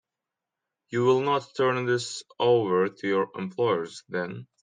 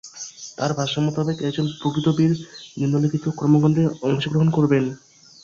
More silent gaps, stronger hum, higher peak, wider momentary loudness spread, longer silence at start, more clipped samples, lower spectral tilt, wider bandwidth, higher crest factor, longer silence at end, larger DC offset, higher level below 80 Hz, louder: neither; neither; second, -10 dBFS vs -4 dBFS; about the same, 10 LU vs 11 LU; first, 0.9 s vs 0.05 s; neither; about the same, -5.5 dB/octave vs -6.5 dB/octave; first, 9.8 kHz vs 7.6 kHz; about the same, 16 dB vs 16 dB; second, 0.2 s vs 0.45 s; neither; second, -74 dBFS vs -58 dBFS; second, -26 LUFS vs -21 LUFS